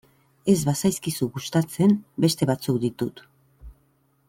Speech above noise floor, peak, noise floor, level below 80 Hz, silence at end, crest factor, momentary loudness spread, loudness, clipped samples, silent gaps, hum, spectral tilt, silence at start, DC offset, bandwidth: 42 dB; -6 dBFS; -65 dBFS; -54 dBFS; 0.55 s; 18 dB; 7 LU; -24 LUFS; under 0.1%; none; none; -6 dB/octave; 0.45 s; under 0.1%; 17 kHz